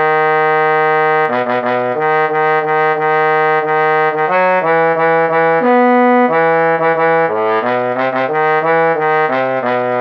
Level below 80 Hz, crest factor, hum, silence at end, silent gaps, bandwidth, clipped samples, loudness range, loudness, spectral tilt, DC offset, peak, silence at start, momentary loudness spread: -76 dBFS; 10 dB; none; 0 s; none; 5.8 kHz; under 0.1%; 2 LU; -13 LUFS; -7.5 dB/octave; under 0.1%; -4 dBFS; 0 s; 4 LU